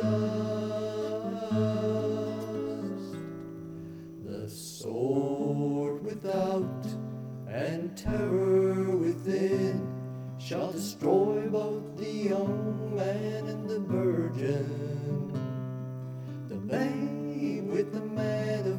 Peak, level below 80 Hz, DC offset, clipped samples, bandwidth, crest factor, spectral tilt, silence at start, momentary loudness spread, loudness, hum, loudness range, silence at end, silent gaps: -14 dBFS; -58 dBFS; under 0.1%; under 0.1%; 18.5 kHz; 16 dB; -7.5 dB/octave; 0 s; 12 LU; -31 LUFS; none; 4 LU; 0 s; none